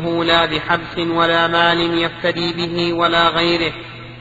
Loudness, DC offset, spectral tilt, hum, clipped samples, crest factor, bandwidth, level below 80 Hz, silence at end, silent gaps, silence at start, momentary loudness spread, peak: -16 LUFS; under 0.1%; -5.5 dB/octave; none; under 0.1%; 18 dB; 7.8 kHz; -44 dBFS; 0 s; none; 0 s; 6 LU; 0 dBFS